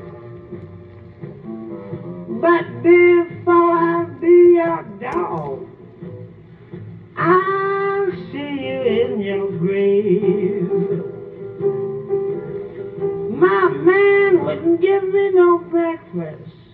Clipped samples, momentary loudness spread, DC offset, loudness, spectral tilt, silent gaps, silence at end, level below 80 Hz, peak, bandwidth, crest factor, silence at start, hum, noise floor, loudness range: under 0.1%; 23 LU; under 0.1%; -17 LUFS; -10 dB/octave; none; 0.25 s; -58 dBFS; -2 dBFS; 4.3 kHz; 16 dB; 0 s; none; -40 dBFS; 7 LU